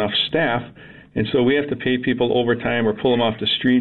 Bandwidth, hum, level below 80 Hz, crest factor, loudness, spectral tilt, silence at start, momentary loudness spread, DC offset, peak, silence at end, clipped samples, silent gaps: 4.4 kHz; none; -50 dBFS; 12 dB; -20 LUFS; -8 dB/octave; 0 s; 7 LU; 0.3%; -8 dBFS; 0 s; under 0.1%; none